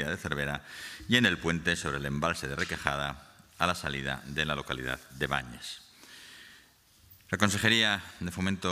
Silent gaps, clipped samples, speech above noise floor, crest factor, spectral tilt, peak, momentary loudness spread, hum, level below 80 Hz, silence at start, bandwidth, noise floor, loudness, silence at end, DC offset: none; under 0.1%; 30 dB; 26 dB; -4 dB/octave; -6 dBFS; 19 LU; none; -54 dBFS; 0 s; 16 kHz; -61 dBFS; -30 LUFS; 0 s; under 0.1%